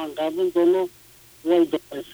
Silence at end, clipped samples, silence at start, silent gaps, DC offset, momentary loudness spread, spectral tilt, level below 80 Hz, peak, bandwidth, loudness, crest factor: 0.1 s; under 0.1%; 0 s; none; under 0.1%; 11 LU; -5.5 dB/octave; -64 dBFS; -8 dBFS; over 20 kHz; -22 LUFS; 14 dB